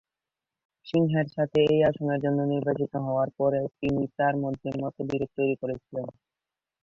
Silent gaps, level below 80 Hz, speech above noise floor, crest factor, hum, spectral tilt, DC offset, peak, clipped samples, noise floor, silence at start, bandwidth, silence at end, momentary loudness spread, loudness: none; -60 dBFS; 63 dB; 16 dB; none; -9 dB/octave; under 0.1%; -12 dBFS; under 0.1%; -89 dBFS; 0.85 s; 7.2 kHz; 0.75 s; 9 LU; -27 LUFS